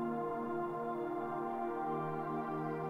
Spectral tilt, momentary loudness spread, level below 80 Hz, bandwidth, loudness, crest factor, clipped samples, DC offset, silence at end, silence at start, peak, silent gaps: -9 dB/octave; 1 LU; -70 dBFS; 15 kHz; -39 LUFS; 12 dB; under 0.1%; under 0.1%; 0 s; 0 s; -28 dBFS; none